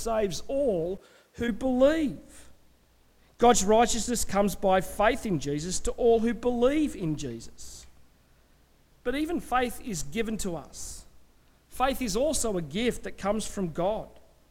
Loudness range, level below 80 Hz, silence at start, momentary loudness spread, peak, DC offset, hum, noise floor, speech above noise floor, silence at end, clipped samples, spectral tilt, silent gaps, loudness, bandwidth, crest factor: 7 LU; -44 dBFS; 0 s; 16 LU; -10 dBFS; under 0.1%; none; -61 dBFS; 34 dB; 0.3 s; under 0.1%; -4 dB/octave; none; -27 LUFS; 17 kHz; 18 dB